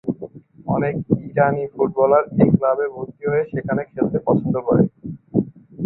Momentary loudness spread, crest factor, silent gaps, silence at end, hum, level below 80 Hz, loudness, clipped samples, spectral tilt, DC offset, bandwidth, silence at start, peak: 12 LU; 18 dB; none; 0 s; none; -52 dBFS; -20 LUFS; under 0.1%; -14 dB/octave; under 0.1%; 4 kHz; 0.05 s; -2 dBFS